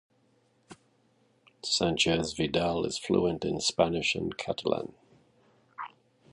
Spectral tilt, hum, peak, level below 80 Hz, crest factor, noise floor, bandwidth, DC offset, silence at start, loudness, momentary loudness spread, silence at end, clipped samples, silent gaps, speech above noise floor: -4 dB/octave; none; -10 dBFS; -56 dBFS; 22 dB; -68 dBFS; 11.5 kHz; under 0.1%; 0.7 s; -29 LUFS; 17 LU; 0.45 s; under 0.1%; none; 39 dB